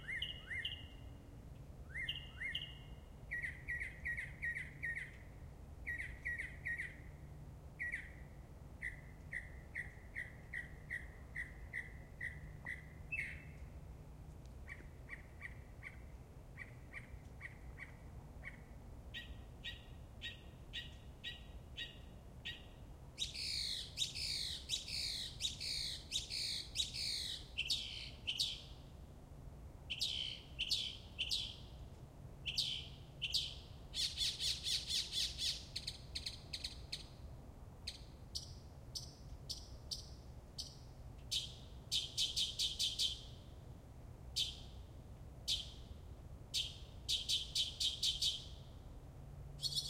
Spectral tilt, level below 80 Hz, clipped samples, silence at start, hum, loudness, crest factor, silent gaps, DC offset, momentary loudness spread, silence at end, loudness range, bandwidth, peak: -1.5 dB/octave; -56 dBFS; under 0.1%; 0 s; none; -42 LUFS; 22 dB; none; under 0.1%; 19 LU; 0 s; 12 LU; 16 kHz; -22 dBFS